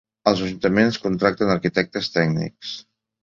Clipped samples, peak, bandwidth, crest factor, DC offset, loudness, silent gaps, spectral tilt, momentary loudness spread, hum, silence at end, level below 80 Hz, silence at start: under 0.1%; -2 dBFS; 7.6 kHz; 20 dB; under 0.1%; -21 LUFS; none; -6 dB/octave; 12 LU; none; 0.45 s; -52 dBFS; 0.25 s